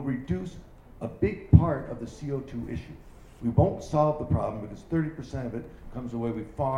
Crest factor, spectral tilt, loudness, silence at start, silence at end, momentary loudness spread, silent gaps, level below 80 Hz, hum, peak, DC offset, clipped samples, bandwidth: 26 dB; -9 dB/octave; -28 LUFS; 0 s; 0 s; 18 LU; none; -40 dBFS; none; -2 dBFS; under 0.1%; under 0.1%; 10 kHz